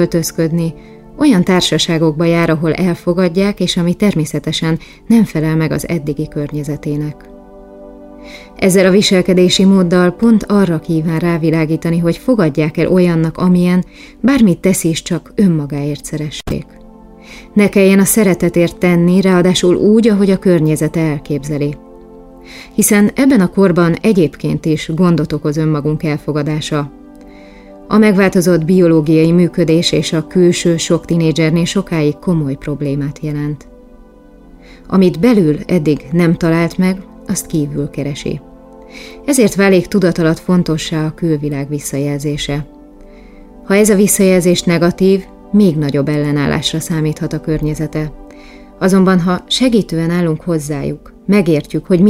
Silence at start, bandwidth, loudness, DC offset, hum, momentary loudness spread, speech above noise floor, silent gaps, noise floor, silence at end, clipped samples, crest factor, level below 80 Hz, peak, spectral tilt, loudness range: 0 s; 16 kHz; -13 LUFS; under 0.1%; none; 10 LU; 28 dB; none; -40 dBFS; 0 s; under 0.1%; 12 dB; -38 dBFS; 0 dBFS; -6 dB/octave; 5 LU